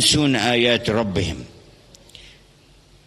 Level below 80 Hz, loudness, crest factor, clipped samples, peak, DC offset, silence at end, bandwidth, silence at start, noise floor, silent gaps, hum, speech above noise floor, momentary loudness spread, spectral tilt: -46 dBFS; -19 LUFS; 20 dB; under 0.1%; -2 dBFS; under 0.1%; 1.6 s; 13 kHz; 0 s; -52 dBFS; none; none; 33 dB; 11 LU; -3.5 dB/octave